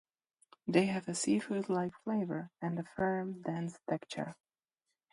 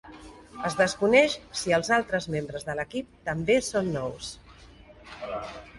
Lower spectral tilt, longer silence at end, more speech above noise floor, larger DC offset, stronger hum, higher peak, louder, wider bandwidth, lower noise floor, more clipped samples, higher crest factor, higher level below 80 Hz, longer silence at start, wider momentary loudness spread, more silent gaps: first, -5.5 dB/octave vs -4 dB/octave; first, 0.8 s vs 0 s; first, 54 dB vs 24 dB; neither; neither; second, -14 dBFS vs -6 dBFS; second, -36 LUFS vs -26 LUFS; about the same, 11.5 kHz vs 11.5 kHz; first, -89 dBFS vs -50 dBFS; neither; about the same, 24 dB vs 22 dB; second, -74 dBFS vs -54 dBFS; first, 0.65 s vs 0.05 s; second, 9 LU vs 20 LU; neither